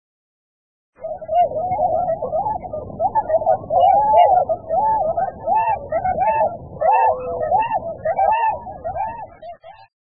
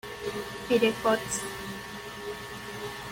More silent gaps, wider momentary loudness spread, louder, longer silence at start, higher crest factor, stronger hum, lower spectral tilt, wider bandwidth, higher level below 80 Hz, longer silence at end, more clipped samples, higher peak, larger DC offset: neither; about the same, 14 LU vs 13 LU; first, -19 LUFS vs -31 LUFS; first, 1 s vs 0.05 s; about the same, 16 dB vs 20 dB; neither; first, -10 dB/octave vs -3.5 dB/octave; second, 3.1 kHz vs 17 kHz; first, -48 dBFS vs -56 dBFS; first, 0.35 s vs 0 s; neither; first, -2 dBFS vs -10 dBFS; first, 0.3% vs under 0.1%